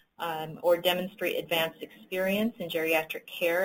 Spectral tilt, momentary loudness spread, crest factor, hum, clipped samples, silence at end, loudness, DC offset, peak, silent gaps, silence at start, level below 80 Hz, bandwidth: -4 dB/octave; 9 LU; 18 dB; none; under 0.1%; 0 s; -29 LUFS; under 0.1%; -12 dBFS; none; 0.2 s; -70 dBFS; 17 kHz